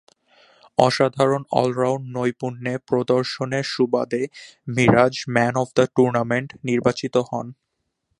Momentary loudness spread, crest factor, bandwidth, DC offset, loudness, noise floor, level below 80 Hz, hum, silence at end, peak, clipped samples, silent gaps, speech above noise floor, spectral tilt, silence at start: 10 LU; 22 dB; 11.5 kHz; under 0.1%; -21 LUFS; -75 dBFS; -56 dBFS; none; 0.65 s; 0 dBFS; under 0.1%; none; 54 dB; -6 dB/octave; 0.8 s